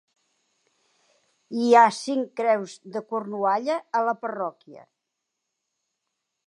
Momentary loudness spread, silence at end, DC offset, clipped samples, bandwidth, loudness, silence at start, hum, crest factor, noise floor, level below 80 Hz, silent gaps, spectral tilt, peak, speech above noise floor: 16 LU; 1.65 s; under 0.1%; under 0.1%; 11 kHz; -24 LUFS; 1.5 s; none; 22 dB; -82 dBFS; -86 dBFS; none; -4.5 dB/octave; -4 dBFS; 58 dB